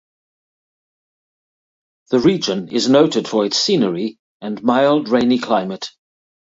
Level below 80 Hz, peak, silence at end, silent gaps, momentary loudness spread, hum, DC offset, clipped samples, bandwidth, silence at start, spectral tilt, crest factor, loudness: -58 dBFS; 0 dBFS; 0.55 s; 4.19-4.40 s; 13 LU; none; under 0.1%; under 0.1%; 8 kHz; 2.1 s; -5 dB/octave; 18 dB; -17 LUFS